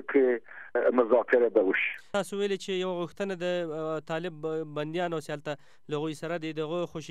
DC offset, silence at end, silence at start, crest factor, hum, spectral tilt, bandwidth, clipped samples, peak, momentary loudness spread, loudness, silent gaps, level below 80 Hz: 0.3%; 0 s; 0 s; 18 dB; none; -5.5 dB/octave; 13 kHz; under 0.1%; -10 dBFS; 11 LU; -29 LUFS; none; -74 dBFS